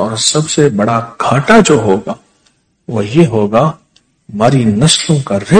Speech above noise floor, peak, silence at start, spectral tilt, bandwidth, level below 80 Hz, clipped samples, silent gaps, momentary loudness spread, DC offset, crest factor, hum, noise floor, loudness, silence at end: 45 dB; 0 dBFS; 0 s; -5 dB/octave; 11 kHz; -42 dBFS; 2%; none; 10 LU; under 0.1%; 12 dB; none; -56 dBFS; -11 LUFS; 0 s